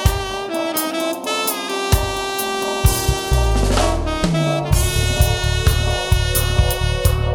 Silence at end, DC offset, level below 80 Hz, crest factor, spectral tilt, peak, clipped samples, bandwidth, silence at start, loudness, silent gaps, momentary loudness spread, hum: 0 s; under 0.1%; -22 dBFS; 16 dB; -4.5 dB/octave; -2 dBFS; under 0.1%; over 20 kHz; 0 s; -19 LUFS; none; 4 LU; none